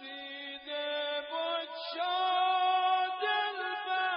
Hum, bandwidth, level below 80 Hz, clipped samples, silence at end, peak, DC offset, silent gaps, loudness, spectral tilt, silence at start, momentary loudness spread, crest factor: none; 5.4 kHz; -86 dBFS; under 0.1%; 0 s; -20 dBFS; under 0.1%; none; -32 LUFS; 5.5 dB/octave; 0 s; 11 LU; 12 dB